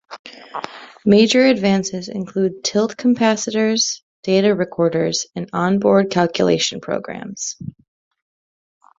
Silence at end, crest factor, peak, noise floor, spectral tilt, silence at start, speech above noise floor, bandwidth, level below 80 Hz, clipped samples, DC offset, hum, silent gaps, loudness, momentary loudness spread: 1.3 s; 18 dB; -2 dBFS; under -90 dBFS; -4.5 dB/octave; 0.1 s; over 73 dB; 7.8 kHz; -58 dBFS; under 0.1%; under 0.1%; none; 0.19-0.24 s, 4.02-4.23 s; -18 LUFS; 16 LU